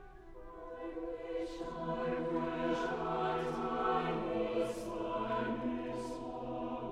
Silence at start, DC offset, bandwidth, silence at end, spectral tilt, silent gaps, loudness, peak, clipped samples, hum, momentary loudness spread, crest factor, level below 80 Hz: 0 s; under 0.1%; 13.5 kHz; 0 s; -6.5 dB/octave; none; -38 LUFS; -20 dBFS; under 0.1%; none; 9 LU; 18 dB; -56 dBFS